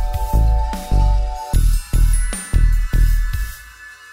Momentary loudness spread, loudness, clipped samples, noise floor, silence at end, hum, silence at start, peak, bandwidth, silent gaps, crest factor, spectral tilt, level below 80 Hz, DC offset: 10 LU; -20 LUFS; under 0.1%; -39 dBFS; 0 s; none; 0 s; -4 dBFS; 16 kHz; none; 12 dB; -5 dB/octave; -16 dBFS; under 0.1%